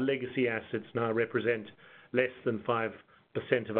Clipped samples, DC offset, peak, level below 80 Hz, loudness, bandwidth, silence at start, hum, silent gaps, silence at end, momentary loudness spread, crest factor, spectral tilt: under 0.1%; under 0.1%; -10 dBFS; -76 dBFS; -32 LUFS; 4.3 kHz; 0 s; none; none; 0 s; 8 LU; 22 dB; -4.5 dB/octave